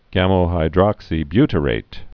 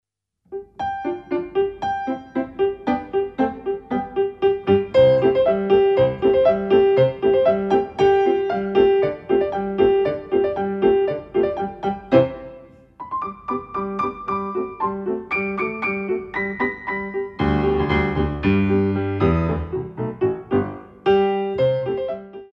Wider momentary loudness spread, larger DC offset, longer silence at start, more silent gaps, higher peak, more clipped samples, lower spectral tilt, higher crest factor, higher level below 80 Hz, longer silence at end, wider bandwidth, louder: second, 6 LU vs 11 LU; neither; second, 0.1 s vs 0.5 s; neither; about the same, 0 dBFS vs -2 dBFS; neither; about the same, -9.5 dB/octave vs -8.5 dB/octave; about the same, 18 dB vs 18 dB; first, -32 dBFS vs -42 dBFS; about the same, 0.1 s vs 0.1 s; second, 5.4 kHz vs 6 kHz; first, -18 LUFS vs -21 LUFS